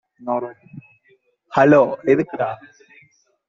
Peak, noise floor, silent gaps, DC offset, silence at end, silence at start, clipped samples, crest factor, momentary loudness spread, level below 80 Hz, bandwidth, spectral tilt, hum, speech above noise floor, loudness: -2 dBFS; -60 dBFS; none; under 0.1%; 0.95 s; 0.2 s; under 0.1%; 18 dB; 14 LU; -62 dBFS; 7.2 kHz; -8 dB/octave; none; 42 dB; -18 LUFS